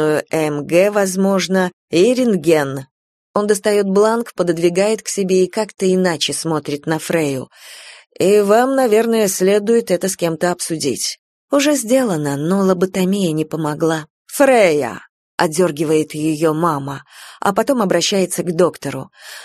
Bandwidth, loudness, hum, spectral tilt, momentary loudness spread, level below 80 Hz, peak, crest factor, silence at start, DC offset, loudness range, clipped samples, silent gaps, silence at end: 13.5 kHz; -16 LUFS; none; -4.5 dB/octave; 10 LU; -62 dBFS; 0 dBFS; 16 dB; 0 s; under 0.1%; 2 LU; under 0.1%; 1.73-1.88 s, 2.91-3.34 s, 11.19-11.48 s, 14.10-14.25 s, 15.09-15.38 s; 0 s